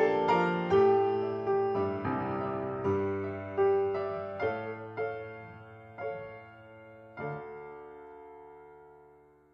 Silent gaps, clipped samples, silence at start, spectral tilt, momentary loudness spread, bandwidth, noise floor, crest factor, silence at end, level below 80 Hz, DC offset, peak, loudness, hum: none; under 0.1%; 0 s; -8 dB/octave; 23 LU; 6.6 kHz; -59 dBFS; 18 dB; 0.5 s; -68 dBFS; under 0.1%; -14 dBFS; -31 LUFS; none